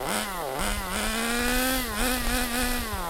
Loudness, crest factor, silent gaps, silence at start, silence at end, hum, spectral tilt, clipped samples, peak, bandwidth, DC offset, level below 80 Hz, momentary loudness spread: -26 LUFS; 18 dB; none; 0 s; 0 s; none; -2.5 dB/octave; under 0.1%; -10 dBFS; 16 kHz; under 0.1%; -34 dBFS; 4 LU